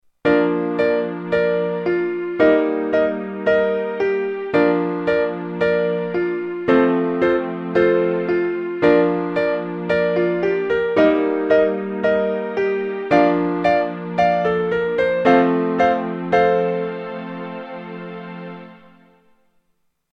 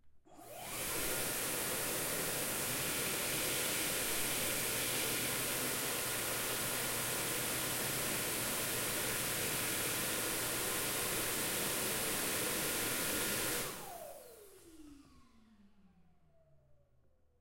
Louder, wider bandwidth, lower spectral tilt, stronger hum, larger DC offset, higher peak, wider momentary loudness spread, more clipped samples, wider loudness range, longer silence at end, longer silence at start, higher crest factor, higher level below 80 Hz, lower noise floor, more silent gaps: first, -19 LUFS vs -35 LUFS; second, 6.6 kHz vs 16.5 kHz; first, -8 dB/octave vs -1.5 dB/octave; neither; neither; first, -2 dBFS vs -22 dBFS; first, 9 LU vs 2 LU; neither; about the same, 3 LU vs 4 LU; first, 1.35 s vs 0.65 s; first, 0.25 s vs 0.05 s; about the same, 18 dB vs 16 dB; first, -54 dBFS vs -60 dBFS; about the same, -67 dBFS vs -69 dBFS; neither